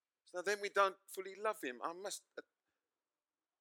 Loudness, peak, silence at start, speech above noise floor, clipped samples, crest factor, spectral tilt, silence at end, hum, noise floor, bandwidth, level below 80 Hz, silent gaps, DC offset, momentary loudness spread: -40 LUFS; -18 dBFS; 0.35 s; over 50 dB; under 0.1%; 24 dB; -1.5 dB/octave; 1.2 s; none; under -90 dBFS; 19 kHz; under -90 dBFS; none; under 0.1%; 15 LU